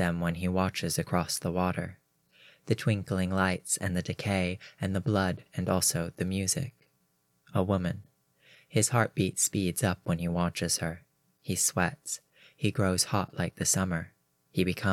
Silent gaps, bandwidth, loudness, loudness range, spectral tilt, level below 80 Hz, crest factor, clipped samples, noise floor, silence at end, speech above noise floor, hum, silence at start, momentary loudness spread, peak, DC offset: none; 16.5 kHz; -30 LUFS; 2 LU; -4.5 dB/octave; -58 dBFS; 22 dB; under 0.1%; -73 dBFS; 0 s; 43 dB; none; 0 s; 9 LU; -10 dBFS; under 0.1%